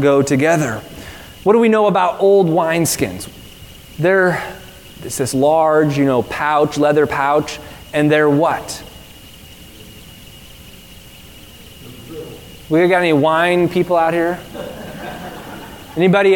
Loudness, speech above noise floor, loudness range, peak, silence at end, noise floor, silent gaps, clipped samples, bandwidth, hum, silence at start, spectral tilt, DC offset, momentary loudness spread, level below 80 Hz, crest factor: -15 LUFS; 25 dB; 8 LU; 0 dBFS; 0 s; -39 dBFS; none; under 0.1%; 18 kHz; none; 0 s; -5.5 dB/octave; 0.1%; 21 LU; -46 dBFS; 16 dB